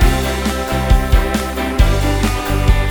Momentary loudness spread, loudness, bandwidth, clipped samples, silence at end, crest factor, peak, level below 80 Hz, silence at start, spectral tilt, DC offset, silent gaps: 4 LU; -16 LUFS; over 20 kHz; under 0.1%; 0 s; 14 dB; 0 dBFS; -16 dBFS; 0 s; -5.5 dB/octave; under 0.1%; none